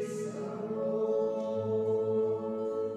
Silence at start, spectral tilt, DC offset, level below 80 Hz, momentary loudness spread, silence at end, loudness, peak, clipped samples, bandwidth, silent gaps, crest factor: 0 s; -7.5 dB/octave; under 0.1%; -74 dBFS; 7 LU; 0 s; -32 LUFS; -22 dBFS; under 0.1%; 11 kHz; none; 10 dB